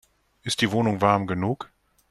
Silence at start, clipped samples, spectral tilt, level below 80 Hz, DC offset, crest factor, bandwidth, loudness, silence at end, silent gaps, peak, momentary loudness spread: 0.45 s; under 0.1%; -5 dB/octave; -58 dBFS; under 0.1%; 20 dB; 13.5 kHz; -24 LUFS; 0.45 s; none; -4 dBFS; 14 LU